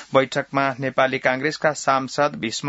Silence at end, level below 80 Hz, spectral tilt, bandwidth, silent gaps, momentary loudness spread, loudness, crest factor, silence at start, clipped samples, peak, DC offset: 0 s; -64 dBFS; -4 dB/octave; 8 kHz; none; 3 LU; -21 LUFS; 20 dB; 0 s; under 0.1%; -2 dBFS; under 0.1%